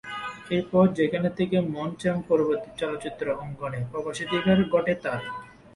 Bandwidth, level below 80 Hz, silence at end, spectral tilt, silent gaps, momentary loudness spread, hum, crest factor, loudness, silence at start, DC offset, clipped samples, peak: 11.5 kHz; -56 dBFS; 0.25 s; -7 dB/octave; none; 11 LU; none; 18 dB; -26 LUFS; 0.05 s; under 0.1%; under 0.1%; -8 dBFS